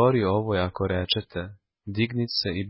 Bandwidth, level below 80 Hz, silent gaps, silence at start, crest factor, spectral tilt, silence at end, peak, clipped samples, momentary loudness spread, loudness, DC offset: 5.8 kHz; -44 dBFS; none; 0 s; 18 dB; -9.5 dB/octave; 0 s; -8 dBFS; under 0.1%; 12 LU; -26 LUFS; under 0.1%